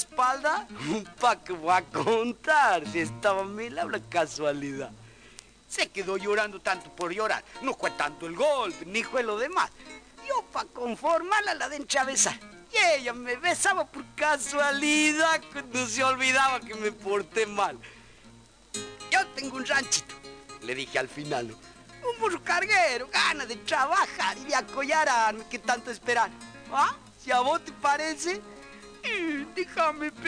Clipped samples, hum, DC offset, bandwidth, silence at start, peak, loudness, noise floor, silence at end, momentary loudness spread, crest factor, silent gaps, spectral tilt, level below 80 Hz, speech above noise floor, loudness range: under 0.1%; none; under 0.1%; 10.5 kHz; 0 s; -10 dBFS; -27 LUFS; -54 dBFS; 0 s; 12 LU; 18 dB; none; -2 dB/octave; -62 dBFS; 26 dB; 6 LU